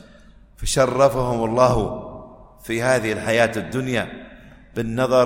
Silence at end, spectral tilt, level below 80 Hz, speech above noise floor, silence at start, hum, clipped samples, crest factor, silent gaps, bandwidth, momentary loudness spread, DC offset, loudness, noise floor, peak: 0 s; -5 dB/octave; -40 dBFS; 28 dB; 0.6 s; none; under 0.1%; 20 dB; none; 16.5 kHz; 16 LU; under 0.1%; -20 LUFS; -48 dBFS; -2 dBFS